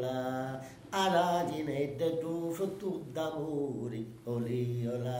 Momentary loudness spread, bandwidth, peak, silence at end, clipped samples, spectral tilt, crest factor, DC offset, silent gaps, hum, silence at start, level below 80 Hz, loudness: 9 LU; 16 kHz; -16 dBFS; 0 s; under 0.1%; -6 dB/octave; 16 dB; under 0.1%; none; none; 0 s; -68 dBFS; -34 LUFS